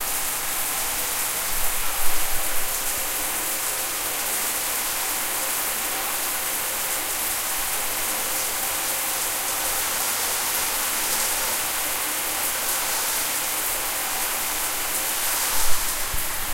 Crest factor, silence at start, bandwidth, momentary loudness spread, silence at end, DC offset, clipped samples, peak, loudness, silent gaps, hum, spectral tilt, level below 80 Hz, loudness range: 18 dB; 0 s; 16 kHz; 2 LU; 0 s; under 0.1%; under 0.1%; -6 dBFS; -23 LUFS; none; none; 0.5 dB/octave; -40 dBFS; 1 LU